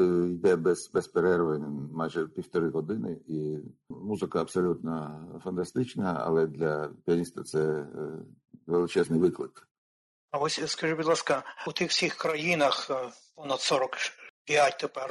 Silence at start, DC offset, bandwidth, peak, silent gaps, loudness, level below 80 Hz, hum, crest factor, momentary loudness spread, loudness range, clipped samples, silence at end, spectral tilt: 0 s; under 0.1%; 12 kHz; -12 dBFS; 9.71-10.28 s, 14.30-14.45 s; -29 LUFS; -70 dBFS; none; 16 dB; 12 LU; 4 LU; under 0.1%; 0 s; -4.5 dB/octave